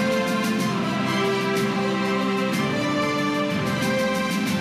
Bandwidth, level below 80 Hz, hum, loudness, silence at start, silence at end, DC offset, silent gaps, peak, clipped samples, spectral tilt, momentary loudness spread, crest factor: 15.5 kHz; -58 dBFS; none; -23 LUFS; 0 s; 0 s; under 0.1%; none; -12 dBFS; under 0.1%; -5 dB/octave; 1 LU; 10 dB